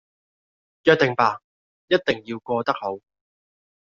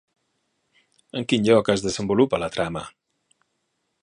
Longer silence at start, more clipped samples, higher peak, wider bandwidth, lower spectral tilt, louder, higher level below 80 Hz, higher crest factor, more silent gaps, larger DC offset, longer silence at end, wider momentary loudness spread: second, 0.85 s vs 1.15 s; neither; about the same, -2 dBFS vs -4 dBFS; second, 7.4 kHz vs 11 kHz; second, -3 dB/octave vs -5 dB/octave; about the same, -22 LUFS vs -22 LUFS; second, -64 dBFS vs -54 dBFS; about the same, 22 dB vs 22 dB; first, 1.44-1.88 s vs none; neither; second, 0.85 s vs 1.15 s; second, 13 LU vs 16 LU